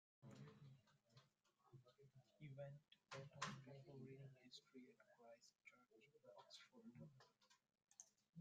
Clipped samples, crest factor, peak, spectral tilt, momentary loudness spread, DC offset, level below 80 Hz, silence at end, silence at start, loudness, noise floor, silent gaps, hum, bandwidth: under 0.1%; 30 dB; -34 dBFS; -4.5 dB/octave; 15 LU; under 0.1%; under -90 dBFS; 0 s; 0.2 s; -62 LUFS; -82 dBFS; none; none; 8.8 kHz